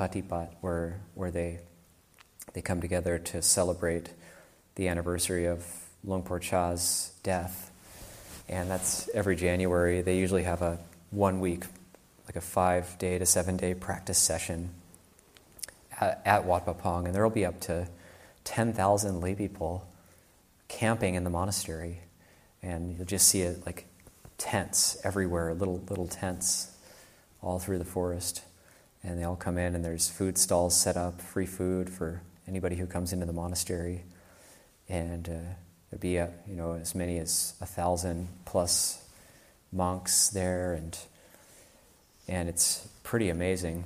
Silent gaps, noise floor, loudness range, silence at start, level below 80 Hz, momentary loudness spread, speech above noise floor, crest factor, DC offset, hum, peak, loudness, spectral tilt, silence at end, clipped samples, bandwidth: none; -62 dBFS; 5 LU; 0 s; -50 dBFS; 17 LU; 32 dB; 24 dB; under 0.1%; none; -8 dBFS; -30 LUFS; -3.5 dB/octave; 0 s; under 0.1%; 15.5 kHz